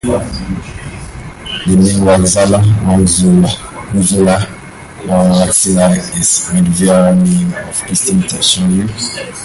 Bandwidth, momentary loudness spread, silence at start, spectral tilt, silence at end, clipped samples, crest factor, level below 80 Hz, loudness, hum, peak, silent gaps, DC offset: 12 kHz; 14 LU; 0.05 s; -5 dB/octave; 0 s; under 0.1%; 12 dB; -30 dBFS; -11 LUFS; none; 0 dBFS; none; under 0.1%